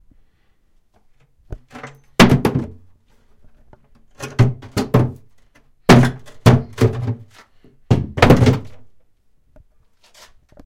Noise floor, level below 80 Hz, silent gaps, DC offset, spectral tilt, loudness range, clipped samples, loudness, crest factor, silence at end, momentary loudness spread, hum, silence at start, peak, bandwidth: -58 dBFS; -36 dBFS; none; under 0.1%; -6.5 dB/octave; 5 LU; 0.1%; -16 LUFS; 18 dB; 1.8 s; 23 LU; none; 1.5 s; 0 dBFS; 16.5 kHz